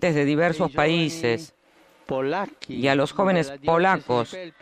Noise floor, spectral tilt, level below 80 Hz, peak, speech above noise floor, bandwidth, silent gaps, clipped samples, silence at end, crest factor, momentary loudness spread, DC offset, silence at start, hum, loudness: -56 dBFS; -6 dB/octave; -58 dBFS; -6 dBFS; 34 dB; 14 kHz; none; under 0.1%; 0.1 s; 18 dB; 9 LU; under 0.1%; 0 s; none; -23 LUFS